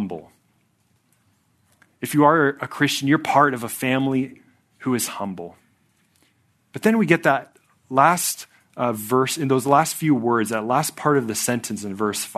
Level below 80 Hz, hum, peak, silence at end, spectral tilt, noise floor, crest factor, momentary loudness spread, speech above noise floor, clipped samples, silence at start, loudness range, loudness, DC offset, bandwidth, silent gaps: -68 dBFS; none; 0 dBFS; 0.05 s; -4.5 dB/octave; -65 dBFS; 22 dB; 14 LU; 44 dB; under 0.1%; 0 s; 4 LU; -21 LUFS; under 0.1%; 14 kHz; none